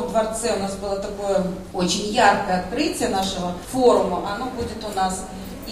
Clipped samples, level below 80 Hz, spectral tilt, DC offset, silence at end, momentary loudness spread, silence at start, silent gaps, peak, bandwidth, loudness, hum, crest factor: under 0.1%; -42 dBFS; -4 dB/octave; under 0.1%; 0 s; 11 LU; 0 s; none; -2 dBFS; 15.5 kHz; -22 LUFS; none; 20 dB